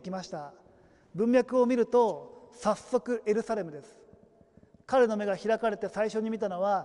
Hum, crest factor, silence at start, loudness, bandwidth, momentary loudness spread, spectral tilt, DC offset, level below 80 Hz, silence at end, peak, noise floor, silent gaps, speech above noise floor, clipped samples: none; 16 dB; 0.05 s; -29 LUFS; 11 kHz; 17 LU; -6 dB/octave; under 0.1%; -68 dBFS; 0 s; -14 dBFS; -60 dBFS; none; 31 dB; under 0.1%